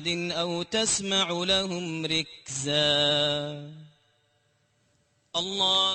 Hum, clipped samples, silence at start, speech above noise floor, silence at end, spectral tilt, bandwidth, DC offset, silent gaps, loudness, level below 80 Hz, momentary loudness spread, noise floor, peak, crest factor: none; under 0.1%; 0 s; 42 dB; 0 s; -2.5 dB/octave; 9 kHz; under 0.1%; none; -25 LUFS; -60 dBFS; 11 LU; -69 dBFS; -10 dBFS; 18 dB